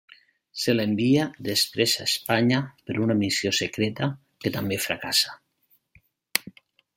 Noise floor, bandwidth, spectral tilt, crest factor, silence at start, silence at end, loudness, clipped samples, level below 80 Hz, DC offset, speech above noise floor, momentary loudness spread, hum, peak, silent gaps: -67 dBFS; 16.5 kHz; -4 dB/octave; 26 dB; 0.55 s; 0.45 s; -24 LUFS; under 0.1%; -64 dBFS; under 0.1%; 43 dB; 8 LU; none; 0 dBFS; none